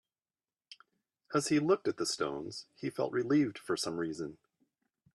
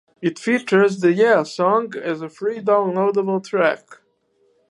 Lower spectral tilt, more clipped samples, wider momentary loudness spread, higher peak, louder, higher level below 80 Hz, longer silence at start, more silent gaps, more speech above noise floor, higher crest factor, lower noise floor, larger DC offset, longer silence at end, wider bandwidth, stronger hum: second, -4.5 dB/octave vs -6 dB/octave; neither; about the same, 12 LU vs 10 LU; second, -16 dBFS vs -2 dBFS; second, -33 LUFS vs -19 LUFS; about the same, -74 dBFS vs -72 dBFS; first, 0.7 s vs 0.2 s; neither; first, over 57 dB vs 45 dB; about the same, 20 dB vs 18 dB; first, under -90 dBFS vs -63 dBFS; neither; about the same, 0.8 s vs 0.75 s; first, 13 kHz vs 11 kHz; neither